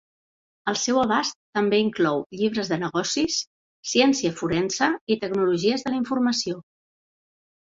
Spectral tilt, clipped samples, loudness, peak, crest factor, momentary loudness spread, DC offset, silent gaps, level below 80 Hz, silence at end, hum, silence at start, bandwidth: -3.5 dB/octave; under 0.1%; -23 LUFS; -6 dBFS; 20 dB; 7 LU; under 0.1%; 1.35-1.53 s, 2.26-2.30 s, 3.47-3.83 s, 5.01-5.07 s; -62 dBFS; 1.15 s; none; 0.65 s; 7.8 kHz